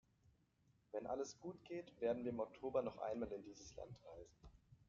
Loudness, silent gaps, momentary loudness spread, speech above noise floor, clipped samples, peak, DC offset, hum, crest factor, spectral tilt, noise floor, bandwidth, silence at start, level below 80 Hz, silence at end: -47 LUFS; none; 16 LU; 31 dB; under 0.1%; -28 dBFS; under 0.1%; none; 20 dB; -6 dB/octave; -78 dBFS; 7.4 kHz; 0.95 s; -72 dBFS; 0.15 s